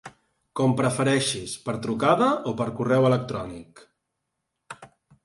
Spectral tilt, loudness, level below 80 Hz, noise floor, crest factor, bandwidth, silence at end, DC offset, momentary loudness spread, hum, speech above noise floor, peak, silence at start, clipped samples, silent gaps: -5.5 dB/octave; -24 LUFS; -60 dBFS; -80 dBFS; 18 dB; 11.5 kHz; 0.4 s; under 0.1%; 23 LU; none; 57 dB; -6 dBFS; 0.05 s; under 0.1%; none